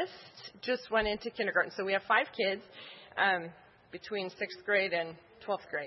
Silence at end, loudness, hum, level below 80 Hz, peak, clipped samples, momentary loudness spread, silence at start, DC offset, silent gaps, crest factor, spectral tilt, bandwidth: 0 s; -32 LUFS; none; -62 dBFS; -12 dBFS; under 0.1%; 19 LU; 0 s; under 0.1%; none; 22 dB; -1 dB/octave; 5.8 kHz